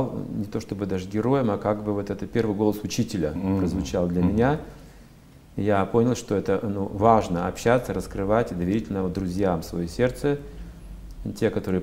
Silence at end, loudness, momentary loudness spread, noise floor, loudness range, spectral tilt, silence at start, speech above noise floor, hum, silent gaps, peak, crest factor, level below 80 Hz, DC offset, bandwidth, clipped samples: 0 s; -25 LUFS; 10 LU; -49 dBFS; 3 LU; -7 dB/octave; 0 s; 25 dB; none; none; -4 dBFS; 22 dB; -44 dBFS; under 0.1%; 16 kHz; under 0.1%